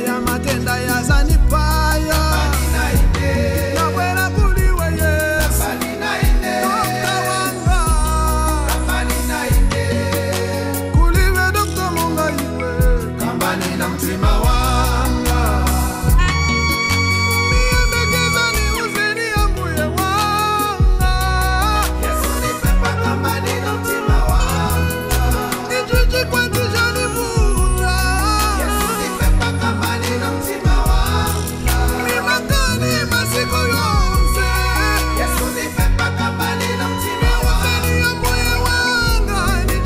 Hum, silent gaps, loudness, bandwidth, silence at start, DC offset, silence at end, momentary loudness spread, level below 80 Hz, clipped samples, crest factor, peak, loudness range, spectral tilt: none; none; -17 LUFS; 16 kHz; 0 s; under 0.1%; 0 s; 4 LU; -20 dBFS; under 0.1%; 12 dB; -4 dBFS; 2 LU; -4.5 dB/octave